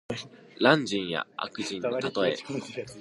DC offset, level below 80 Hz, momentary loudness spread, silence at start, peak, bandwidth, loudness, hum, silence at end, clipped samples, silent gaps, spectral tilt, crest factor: under 0.1%; -66 dBFS; 15 LU; 0.1 s; -4 dBFS; 11.5 kHz; -28 LUFS; none; 0 s; under 0.1%; none; -4.5 dB/octave; 24 dB